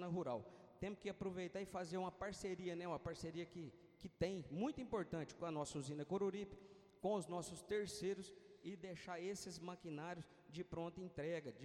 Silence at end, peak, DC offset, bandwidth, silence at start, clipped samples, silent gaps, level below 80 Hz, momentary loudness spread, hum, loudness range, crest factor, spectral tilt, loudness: 0 s; -28 dBFS; under 0.1%; 14 kHz; 0 s; under 0.1%; none; -70 dBFS; 11 LU; none; 3 LU; 18 dB; -5.5 dB/octave; -48 LUFS